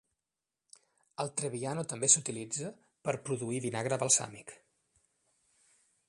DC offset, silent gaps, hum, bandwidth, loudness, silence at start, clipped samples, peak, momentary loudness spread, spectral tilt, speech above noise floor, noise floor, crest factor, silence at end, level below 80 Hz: under 0.1%; none; none; 11.5 kHz; -31 LUFS; 1.2 s; under 0.1%; -8 dBFS; 19 LU; -3 dB/octave; over 57 dB; under -90 dBFS; 28 dB; 1.55 s; -76 dBFS